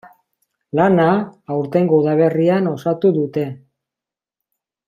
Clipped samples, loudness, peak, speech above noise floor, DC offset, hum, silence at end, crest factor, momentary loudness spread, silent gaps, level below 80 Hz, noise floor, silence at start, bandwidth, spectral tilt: under 0.1%; -17 LUFS; -2 dBFS; 72 dB; under 0.1%; none; 1.3 s; 16 dB; 10 LU; none; -62 dBFS; -88 dBFS; 0.05 s; 7.2 kHz; -9 dB/octave